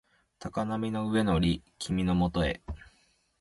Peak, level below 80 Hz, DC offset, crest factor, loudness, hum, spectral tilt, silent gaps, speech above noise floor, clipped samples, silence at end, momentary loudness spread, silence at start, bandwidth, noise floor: -16 dBFS; -44 dBFS; under 0.1%; 16 dB; -30 LUFS; none; -6.5 dB/octave; none; 39 dB; under 0.1%; 0.55 s; 14 LU; 0.4 s; 11.5 kHz; -68 dBFS